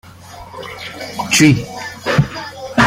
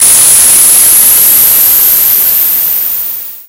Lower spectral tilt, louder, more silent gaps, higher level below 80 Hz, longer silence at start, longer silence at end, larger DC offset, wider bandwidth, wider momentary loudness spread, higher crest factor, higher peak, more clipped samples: first, -4.5 dB/octave vs 1.5 dB/octave; second, -15 LUFS vs -2 LUFS; neither; about the same, -42 dBFS vs -42 dBFS; about the same, 0.05 s vs 0 s; about the same, 0 s vs 0.05 s; neither; second, 16.5 kHz vs over 20 kHz; first, 22 LU vs 8 LU; first, 16 dB vs 6 dB; about the same, -2 dBFS vs 0 dBFS; second, under 0.1% vs 6%